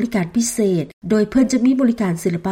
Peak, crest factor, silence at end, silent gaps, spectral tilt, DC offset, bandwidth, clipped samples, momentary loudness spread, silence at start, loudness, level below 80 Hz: -6 dBFS; 12 dB; 0 s; 0.93-1.02 s; -5.5 dB/octave; under 0.1%; 16.5 kHz; under 0.1%; 5 LU; 0 s; -18 LUFS; -48 dBFS